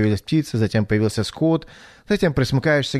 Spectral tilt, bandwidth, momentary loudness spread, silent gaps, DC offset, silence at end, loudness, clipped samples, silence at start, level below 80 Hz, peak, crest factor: -6.5 dB/octave; 13.5 kHz; 4 LU; none; under 0.1%; 0 s; -21 LUFS; under 0.1%; 0 s; -44 dBFS; -6 dBFS; 14 dB